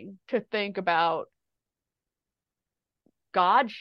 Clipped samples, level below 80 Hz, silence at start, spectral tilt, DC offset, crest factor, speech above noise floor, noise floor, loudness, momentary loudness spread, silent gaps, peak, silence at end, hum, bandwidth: under 0.1%; -80 dBFS; 0 s; -6.5 dB/octave; under 0.1%; 20 dB; 64 dB; -89 dBFS; -26 LUFS; 10 LU; none; -10 dBFS; 0 s; none; 6.2 kHz